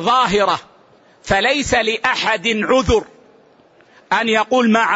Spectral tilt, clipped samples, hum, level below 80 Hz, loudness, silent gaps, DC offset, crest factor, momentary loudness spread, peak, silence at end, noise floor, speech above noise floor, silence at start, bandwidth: -4 dB/octave; under 0.1%; none; -38 dBFS; -16 LUFS; none; under 0.1%; 14 dB; 5 LU; -4 dBFS; 0 s; -50 dBFS; 35 dB; 0 s; 8 kHz